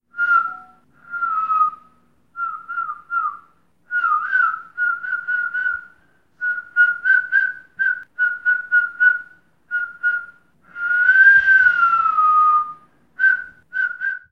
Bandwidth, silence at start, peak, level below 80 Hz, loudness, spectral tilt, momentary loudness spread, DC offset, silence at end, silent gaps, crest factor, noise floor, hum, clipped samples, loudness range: 6.2 kHz; 0.15 s; -2 dBFS; -66 dBFS; -18 LUFS; -2 dB/octave; 14 LU; 0.1%; 0.15 s; none; 16 dB; -58 dBFS; none; under 0.1%; 8 LU